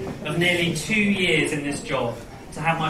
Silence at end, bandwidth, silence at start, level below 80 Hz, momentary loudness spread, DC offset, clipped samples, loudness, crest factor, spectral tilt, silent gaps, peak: 0 s; 15.5 kHz; 0 s; -48 dBFS; 10 LU; under 0.1%; under 0.1%; -22 LUFS; 16 dB; -4.5 dB/octave; none; -8 dBFS